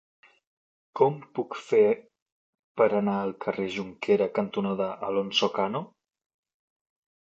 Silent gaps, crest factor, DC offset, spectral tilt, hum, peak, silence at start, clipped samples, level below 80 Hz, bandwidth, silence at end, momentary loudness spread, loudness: 2.22-2.26 s, 2.32-2.53 s, 2.59-2.75 s; 22 dB; under 0.1%; -5.5 dB/octave; none; -6 dBFS; 0.95 s; under 0.1%; -72 dBFS; 7.8 kHz; 1.35 s; 11 LU; -27 LUFS